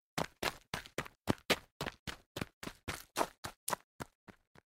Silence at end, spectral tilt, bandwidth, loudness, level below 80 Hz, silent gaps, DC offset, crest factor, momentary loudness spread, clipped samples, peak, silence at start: 0.4 s; -3.5 dB/octave; 16 kHz; -40 LUFS; -62 dBFS; 1.71-1.80 s, 1.99-2.06 s, 2.26-2.35 s, 2.53-2.61 s, 3.38-3.43 s, 3.56-3.67 s, 3.84-3.99 s, 4.15-4.27 s; under 0.1%; 30 dB; 11 LU; under 0.1%; -12 dBFS; 0.15 s